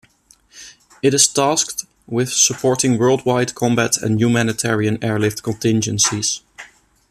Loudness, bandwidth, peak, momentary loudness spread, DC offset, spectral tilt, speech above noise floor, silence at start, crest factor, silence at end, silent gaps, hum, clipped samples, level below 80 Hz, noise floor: -17 LUFS; 14.5 kHz; 0 dBFS; 8 LU; under 0.1%; -3.5 dB/octave; 36 dB; 0.55 s; 18 dB; 0.45 s; none; none; under 0.1%; -54 dBFS; -54 dBFS